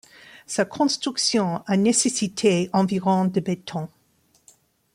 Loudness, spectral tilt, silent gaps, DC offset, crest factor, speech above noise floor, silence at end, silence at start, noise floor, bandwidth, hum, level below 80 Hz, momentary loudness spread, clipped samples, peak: -22 LUFS; -4.5 dB/octave; none; under 0.1%; 16 dB; 41 dB; 1.05 s; 0.35 s; -63 dBFS; 15 kHz; none; -64 dBFS; 10 LU; under 0.1%; -8 dBFS